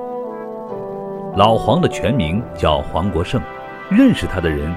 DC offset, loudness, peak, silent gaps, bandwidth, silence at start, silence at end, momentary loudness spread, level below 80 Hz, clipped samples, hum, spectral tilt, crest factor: under 0.1%; -18 LUFS; 0 dBFS; none; 13.5 kHz; 0 s; 0 s; 15 LU; -34 dBFS; under 0.1%; none; -7 dB/octave; 18 dB